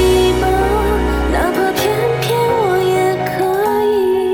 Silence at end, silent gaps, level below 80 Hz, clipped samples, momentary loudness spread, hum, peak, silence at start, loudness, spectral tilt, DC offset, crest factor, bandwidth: 0 s; none; -26 dBFS; under 0.1%; 3 LU; none; -2 dBFS; 0 s; -15 LUFS; -5.5 dB/octave; under 0.1%; 12 dB; 19 kHz